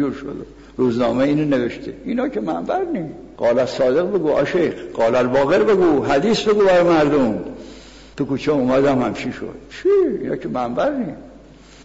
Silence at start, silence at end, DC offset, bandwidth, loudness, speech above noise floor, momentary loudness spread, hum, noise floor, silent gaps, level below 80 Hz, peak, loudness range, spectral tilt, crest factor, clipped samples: 0 s; 0 s; 0.2%; 8 kHz; -18 LUFS; 25 dB; 15 LU; none; -43 dBFS; none; -48 dBFS; -8 dBFS; 4 LU; -6.5 dB/octave; 10 dB; under 0.1%